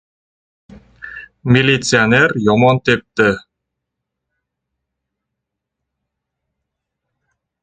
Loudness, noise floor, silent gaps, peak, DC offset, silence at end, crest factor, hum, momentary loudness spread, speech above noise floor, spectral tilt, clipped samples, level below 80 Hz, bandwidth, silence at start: -13 LUFS; -79 dBFS; none; 0 dBFS; under 0.1%; 4.25 s; 18 dB; none; 17 LU; 66 dB; -5 dB/octave; under 0.1%; -50 dBFS; 9.4 kHz; 1.05 s